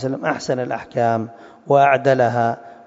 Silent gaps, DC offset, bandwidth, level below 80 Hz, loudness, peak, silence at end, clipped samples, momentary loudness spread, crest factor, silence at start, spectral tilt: none; under 0.1%; 7.8 kHz; -64 dBFS; -18 LUFS; -2 dBFS; 0.1 s; under 0.1%; 10 LU; 16 dB; 0 s; -6.5 dB/octave